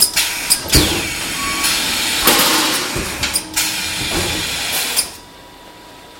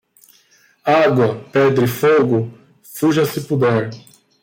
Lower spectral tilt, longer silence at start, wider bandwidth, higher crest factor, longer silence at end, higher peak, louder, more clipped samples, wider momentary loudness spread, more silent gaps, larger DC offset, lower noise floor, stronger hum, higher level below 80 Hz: second, -1.5 dB/octave vs -6.5 dB/octave; second, 0 s vs 0.85 s; about the same, 17 kHz vs 17 kHz; about the same, 18 dB vs 14 dB; second, 0 s vs 0.45 s; first, 0 dBFS vs -4 dBFS; about the same, -15 LUFS vs -16 LUFS; neither; about the same, 8 LU vs 10 LU; neither; neither; second, -39 dBFS vs -54 dBFS; neither; first, -34 dBFS vs -58 dBFS